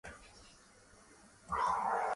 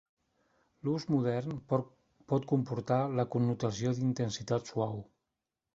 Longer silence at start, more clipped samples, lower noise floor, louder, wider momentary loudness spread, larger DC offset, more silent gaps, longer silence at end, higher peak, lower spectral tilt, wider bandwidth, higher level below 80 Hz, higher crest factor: second, 0.05 s vs 0.85 s; neither; second, -62 dBFS vs -88 dBFS; about the same, -35 LUFS vs -33 LUFS; first, 25 LU vs 5 LU; neither; neither; second, 0 s vs 0.7 s; second, -22 dBFS vs -14 dBFS; second, -3.5 dB/octave vs -7 dB/octave; first, 11.5 kHz vs 7.8 kHz; about the same, -64 dBFS vs -66 dBFS; about the same, 16 dB vs 20 dB